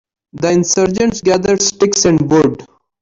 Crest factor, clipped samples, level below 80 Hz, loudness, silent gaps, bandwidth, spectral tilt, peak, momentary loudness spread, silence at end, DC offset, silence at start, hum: 12 dB; under 0.1%; -44 dBFS; -13 LUFS; none; 7.8 kHz; -4 dB/octave; -2 dBFS; 5 LU; 0.35 s; under 0.1%; 0.35 s; none